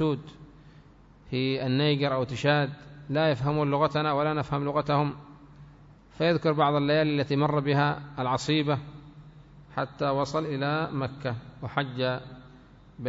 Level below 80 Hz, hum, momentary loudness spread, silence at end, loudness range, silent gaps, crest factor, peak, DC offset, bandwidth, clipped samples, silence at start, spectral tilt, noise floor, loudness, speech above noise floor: -56 dBFS; none; 11 LU; 0 s; 5 LU; none; 18 dB; -10 dBFS; under 0.1%; 7.8 kHz; under 0.1%; 0 s; -7 dB/octave; -53 dBFS; -27 LUFS; 27 dB